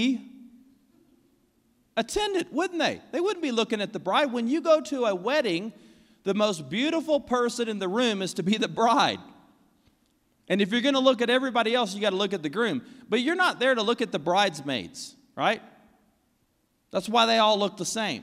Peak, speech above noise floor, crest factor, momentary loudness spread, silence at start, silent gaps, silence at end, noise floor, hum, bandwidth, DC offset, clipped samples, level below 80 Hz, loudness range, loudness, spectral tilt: -8 dBFS; 45 dB; 20 dB; 10 LU; 0 s; none; 0 s; -70 dBFS; none; 15.5 kHz; under 0.1%; under 0.1%; -64 dBFS; 4 LU; -25 LUFS; -4 dB/octave